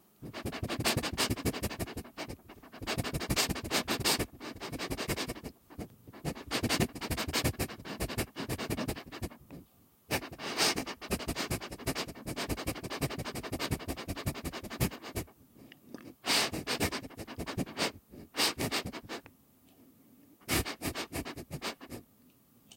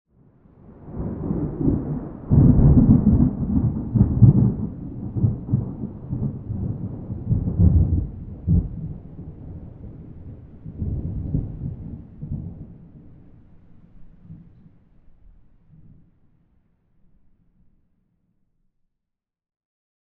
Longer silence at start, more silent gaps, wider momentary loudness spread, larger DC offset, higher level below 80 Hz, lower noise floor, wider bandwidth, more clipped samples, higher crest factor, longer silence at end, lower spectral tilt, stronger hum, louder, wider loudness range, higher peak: second, 0.2 s vs 0.7 s; neither; second, 16 LU vs 24 LU; neither; second, -50 dBFS vs -32 dBFS; second, -64 dBFS vs -83 dBFS; first, 17 kHz vs 2 kHz; neither; about the same, 22 dB vs 22 dB; second, 0 s vs 5.65 s; second, -3.5 dB/octave vs -15.5 dB/octave; neither; second, -35 LUFS vs -21 LUFS; second, 4 LU vs 16 LU; second, -14 dBFS vs 0 dBFS